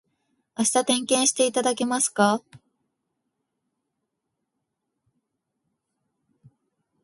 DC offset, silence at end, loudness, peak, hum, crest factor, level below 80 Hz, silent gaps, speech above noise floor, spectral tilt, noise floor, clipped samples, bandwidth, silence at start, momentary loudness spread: under 0.1%; 4.45 s; -22 LUFS; -4 dBFS; none; 22 dB; -74 dBFS; none; 58 dB; -2.5 dB/octave; -81 dBFS; under 0.1%; 12 kHz; 0.6 s; 5 LU